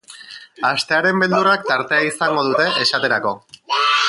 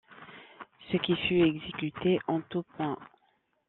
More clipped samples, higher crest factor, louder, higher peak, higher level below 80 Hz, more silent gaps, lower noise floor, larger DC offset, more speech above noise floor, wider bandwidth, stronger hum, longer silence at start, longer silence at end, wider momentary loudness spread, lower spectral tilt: neither; about the same, 16 dB vs 18 dB; first, -17 LUFS vs -30 LUFS; first, -4 dBFS vs -14 dBFS; about the same, -66 dBFS vs -64 dBFS; neither; second, -39 dBFS vs -72 dBFS; neither; second, 21 dB vs 43 dB; first, 11.5 kHz vs 4.2 kHz; neither; about the same, 0.1 s vs 0.1 s; second, 0 s vs 0.65 s; second, 13 LU vs 23 LU; about the same, -3.5 dB/octave vs -4.5 dB/octave